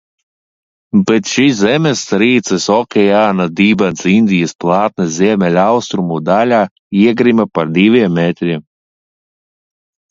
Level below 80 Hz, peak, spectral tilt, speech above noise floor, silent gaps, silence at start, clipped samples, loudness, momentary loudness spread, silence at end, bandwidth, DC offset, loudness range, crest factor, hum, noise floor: -52 dBFS; 0 dBFS; -5.5 dB/octave; over 78 dB; 4.55-4.59 s, 6.71-6.91 s; 0.95 s; under 0.1%; -12 LUFS; 5 LU; 1.5 s; 7.8 kHz; under 0.1%; 2 LU; 12 dB; none; under -90 dBFS